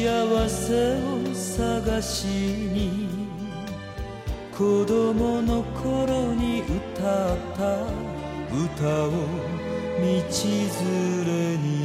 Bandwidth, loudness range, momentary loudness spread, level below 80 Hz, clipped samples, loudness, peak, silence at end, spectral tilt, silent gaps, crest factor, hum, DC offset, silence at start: 16 kHz; 3 LU; 10 LU; -38 dBFS; under 0.1%; -26 LUFS; -10 dBFS; 0 s; -5.5 dB/octave; none; 14 dB; none; under 0.1%; 0 s